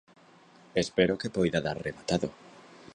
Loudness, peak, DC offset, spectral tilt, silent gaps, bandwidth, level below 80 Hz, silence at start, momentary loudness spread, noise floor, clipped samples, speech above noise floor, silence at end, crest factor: -30 LUFS; -8 dBFS; under 0.1%; -5.5 dB/octave; none; 10.5 kHz; -56 dBFS; 0.75 s; 8 LU; -57 dBFS; under 0.1%; 28 dB; 0.35 s; 22 dB